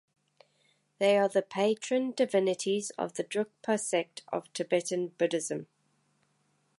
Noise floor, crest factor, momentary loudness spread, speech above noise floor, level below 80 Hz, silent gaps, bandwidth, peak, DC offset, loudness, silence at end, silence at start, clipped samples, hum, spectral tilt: -73 dBFS; 18 dB; 9 LU; 43 dB; -84 dBFS; none; 11.5 kHz; -12 dBFS; under 0.1%; -30 LUFS; 1.15 s; 1 s; under 0.1%; none; -4 dB/octave